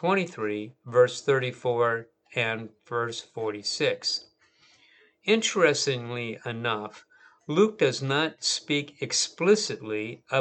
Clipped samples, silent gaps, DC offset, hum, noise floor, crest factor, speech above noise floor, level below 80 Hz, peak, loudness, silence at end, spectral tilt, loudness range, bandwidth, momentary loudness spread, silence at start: under 0.1%; none; under 0.1%; none; -62 dBFS; 22 dB; 35 dB; -80 dBFS; -6 dBFS; -27 LUFS; 0 s; -3.5 dB/octave; 3 LU; 9.2 kHz; 11 LU; 0 s